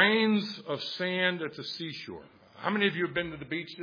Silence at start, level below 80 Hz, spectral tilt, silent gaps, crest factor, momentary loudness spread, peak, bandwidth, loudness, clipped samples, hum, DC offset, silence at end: 0 s; -66 dBFS; -6 dB/octave; none; 20 dB; 11 LU; -10 dBFS; 5.2 kHz; -30 LUFS; under 0.1%; none; under 0.1%; 0 s